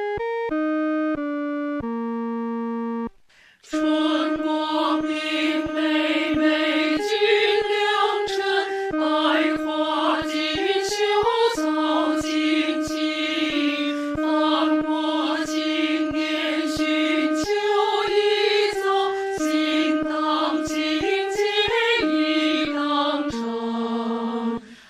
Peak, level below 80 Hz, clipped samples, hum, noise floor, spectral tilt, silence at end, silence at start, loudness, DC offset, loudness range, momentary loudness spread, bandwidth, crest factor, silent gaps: -8 dBFS; -54 dBFS; under 0.1%; none; -54 dBFS; -3.5 dB/octave; 0.15 s; 0 s; -22 LUFS; under 0.1%; 4 LU; 7 LU; 14 kHz; 14 dB; none